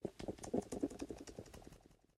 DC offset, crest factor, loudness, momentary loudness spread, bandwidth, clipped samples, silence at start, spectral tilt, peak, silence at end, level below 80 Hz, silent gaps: under 0.1%; 24 dB; -46 LUFS; 17 LU; 15 kHz; under 0.1%; 0 s; -6 dB/octave; -22 dBFS; 0.2 s; -64 dBFS; none